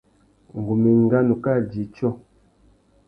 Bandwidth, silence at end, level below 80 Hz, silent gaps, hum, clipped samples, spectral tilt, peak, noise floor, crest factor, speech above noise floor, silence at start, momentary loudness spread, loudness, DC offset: 5.2 kHz; 0.9 s; -54 dBFS; none; none; under 0.1%; -11.5 dB/octave; -6 dBFS; -57 dBFS; 16 dB; 38 dB; 0.55 s; 15 LU; -21 LUFS; under 0.1%